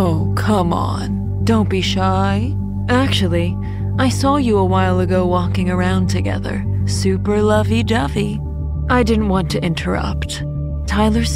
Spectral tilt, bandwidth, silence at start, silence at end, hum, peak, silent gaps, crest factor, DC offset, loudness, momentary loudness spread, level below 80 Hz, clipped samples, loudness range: -6.5 dB/octave; 14.5 kHz; 0 s; 0 s; none; -2 dBFS; none; 14 dB; under 0.1%; -17 LUFS; 7 LU; -28 dBFS; under 0.1%; 1 LU